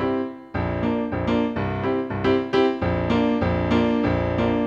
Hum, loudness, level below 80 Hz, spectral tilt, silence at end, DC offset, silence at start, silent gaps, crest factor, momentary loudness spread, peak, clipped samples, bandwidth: none; -23 LUFS; -40 dBFS; -8 dB/octave; 0 s; under 0.1%; 0 s; none; 16 dB; 5 LU; -6 dBFS; under 0.1%; 7.2 kHz